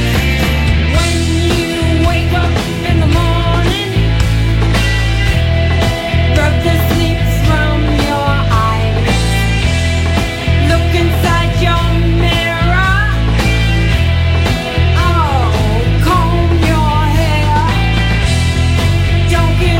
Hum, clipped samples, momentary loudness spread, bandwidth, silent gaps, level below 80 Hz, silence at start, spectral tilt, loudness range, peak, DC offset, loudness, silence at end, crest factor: none; under 0.1%; 2 LU; 16.5 kHz; none; -16 dBFS; 0 s; -5.5 dB/octave; 1 LU; 0 dBFS; under 0.1%; -12 LUFS; 0 s; 10 dB